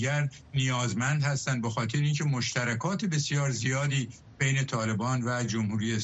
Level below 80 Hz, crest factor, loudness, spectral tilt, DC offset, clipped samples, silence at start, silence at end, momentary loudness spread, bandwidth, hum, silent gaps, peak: -62 dBFS; 14 dB; -29 LUFS; -5 dB/octave; under 0.1%; under 0.1%; 0 s; 0 s; 3 LU; 8.4 kHz; none; none; -14 dBFS